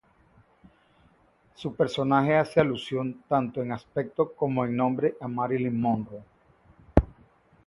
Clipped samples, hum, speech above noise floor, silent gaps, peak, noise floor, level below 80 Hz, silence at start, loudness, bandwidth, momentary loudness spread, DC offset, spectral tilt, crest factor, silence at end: under 0.1%; none; 36 dB; none; 0 dBFS; -62 dBFS; -42 dBFS; 1.6 s; -27 LUFS; 11.5 kHz; 10 LU; under 0.1%; -8 dB/octave; 28 dB; 0.6 s